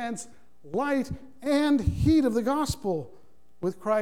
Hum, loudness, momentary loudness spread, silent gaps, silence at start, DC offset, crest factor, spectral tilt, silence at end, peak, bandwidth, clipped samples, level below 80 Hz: none; -27 LUFS; 13 LU; none; 0 s; 0.5%; 14 dB; -6.5 dB/octave; 0 s; -12 dBFS; 16 kHz; under 0.1%; -42 dBFS